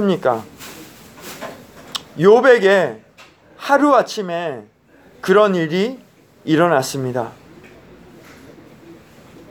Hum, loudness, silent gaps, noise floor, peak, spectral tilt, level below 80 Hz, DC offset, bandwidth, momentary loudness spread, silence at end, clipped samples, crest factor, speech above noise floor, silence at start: none; -16 LUFS; none; -47 dBFS; 0 dBFS; -5.5 dB/octave; -60 dBFS; under 0.1%; over 20 kHz; 24 LU; 0.6 s; under 0.1%; 18 dB; 31 dB; 0 s